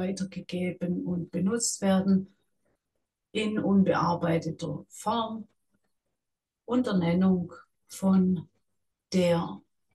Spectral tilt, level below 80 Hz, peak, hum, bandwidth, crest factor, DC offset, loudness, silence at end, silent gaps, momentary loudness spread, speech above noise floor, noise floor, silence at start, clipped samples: -6 dB/octave; -64 dBFS; -14 dBFS; none; 12.5 kHz; 14 dB; under 0.1%; -28 LUFS; 0.35 s; none; 12 LU; 60 dB; -87 dBFS; 0 s; under 0.1%